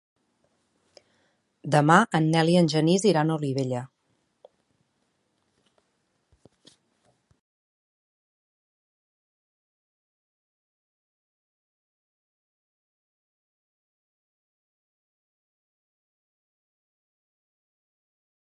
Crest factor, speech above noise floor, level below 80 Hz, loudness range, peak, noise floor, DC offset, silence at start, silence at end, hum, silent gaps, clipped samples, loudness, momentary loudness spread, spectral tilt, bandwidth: 28 dB; 52 dB; -74 dBFS; 13 LU; -2 dBFS; -74 dBFS; under 0.1%; 1.65 s; 14.6 s; none; none; under 0.1%; -22 LUFS; 11 LU; -6 dB/octave; 11.5 kHz